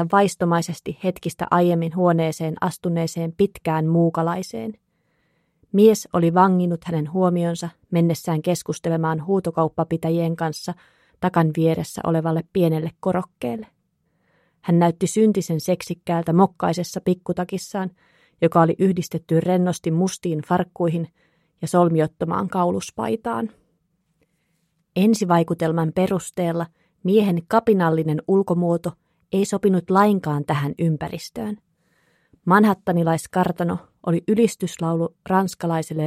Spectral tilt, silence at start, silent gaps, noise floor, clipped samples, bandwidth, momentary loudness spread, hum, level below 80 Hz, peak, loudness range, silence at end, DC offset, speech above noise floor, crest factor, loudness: -7 dB/octave; 0 s; none; -69 dBFS; under 0.1%; 14.5 kHz; 11 LU; none; -58 dBFS; -2 dBFS; 3 LU; 0 s; under 0.1%; 49 dB; 20 dB; -21 LUFS